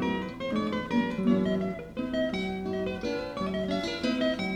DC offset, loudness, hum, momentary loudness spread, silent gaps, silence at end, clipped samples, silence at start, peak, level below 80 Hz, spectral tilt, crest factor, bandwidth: under 0.1%; -30 LUFS; none; 6 LU; none; 0 s; under 0.1%; 0 s; -12 dBFS; -52 dBFS; -6.5 dB/octave; 16 dB; 11 kHz